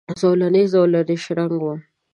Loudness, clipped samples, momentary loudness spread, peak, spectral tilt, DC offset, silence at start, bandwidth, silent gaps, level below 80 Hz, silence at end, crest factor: -18 LUFS; under 0.1%; 10 LU; -4 dBFS; -7.5 dB/octave; under 0.1%; 0.1 s; 10.5 kHz; none; -66 dBFS; 0.35 s; 14 dB